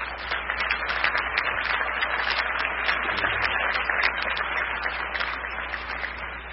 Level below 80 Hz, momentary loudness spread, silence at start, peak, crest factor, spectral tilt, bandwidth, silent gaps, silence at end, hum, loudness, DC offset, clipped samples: -44 dBFS; 7 LU; 0 s; -8 dBFS; 20 dB; -5.5 dB/octave; 6 kHz; none; 0 s; none; -25 LUFS; under 0.1%; under 0.1%